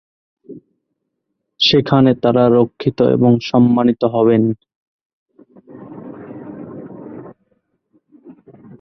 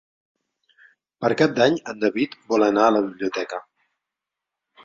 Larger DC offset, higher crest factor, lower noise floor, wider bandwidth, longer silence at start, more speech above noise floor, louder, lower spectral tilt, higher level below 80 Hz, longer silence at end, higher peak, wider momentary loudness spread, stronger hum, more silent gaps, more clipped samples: neither; second, 16 dB vs 22 dB; second, -74 dBFS vs -86 dBFS; second, 6.4 kHz vs 7.6 kHz; second, 0.5 s vs 1.2 s; second, 61 dB vs 65 dB; first, -14 LUFS vs -21 LUFS; first, -7.5 dB/octave vs -5.5 dB/octave; first, -54 dBFS vs -64 dBFS; second, 0.5 s vs 1.25 s; about the same, -2 dBFS vs -2 dBFS; first, 22 LU vs 10 LU; neither; first, 4.76-5.26 s vs none; neither